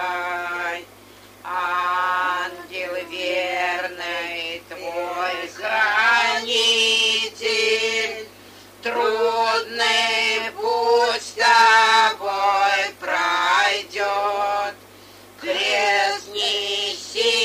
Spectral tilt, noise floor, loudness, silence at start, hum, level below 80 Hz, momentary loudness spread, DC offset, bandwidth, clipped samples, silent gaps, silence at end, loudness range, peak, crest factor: 0 dB/octave; -46 dBFS; -20 LUFS; 0 s; 50 Hz at -60 dBFS; -66 dBFS; 12 LU; under 0.1%; 15.5 kHz; under 0.1%; none; 0 s; 7 LU; -2 dBFS; 18 dB